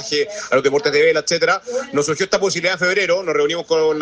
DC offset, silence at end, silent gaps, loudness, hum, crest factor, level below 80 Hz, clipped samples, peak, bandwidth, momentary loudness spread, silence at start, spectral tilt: under 0.1%; 0 s; none; -17 LUFS; none; 16 dB; -60 dBFS; under 0.1%; 0 dBFS; 9.8 kHz; 5 LU; 0 s; -3 dB/octave